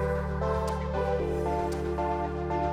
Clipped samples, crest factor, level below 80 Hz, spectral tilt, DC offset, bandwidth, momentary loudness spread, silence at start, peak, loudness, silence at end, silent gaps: under 0.1%; 12 dB; -36 dBFS; -7.5 dB/octave; under 0.1%; 13 kHz; 2 LU; 0 s; -16 dBFS; -30 LUFS; 0 s; none